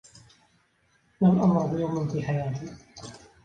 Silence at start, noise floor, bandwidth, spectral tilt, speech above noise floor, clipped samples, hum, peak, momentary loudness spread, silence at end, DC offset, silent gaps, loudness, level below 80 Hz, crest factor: 1.2 s; -67 dBFS; 9 kHz; -8.5 dB/octave; 42 dB; under 0.1%; none; -10 dBFS; 22 LU; 0.25 s; under 0.1%; none; -25 LUFS; -58 dBFS; 18 dB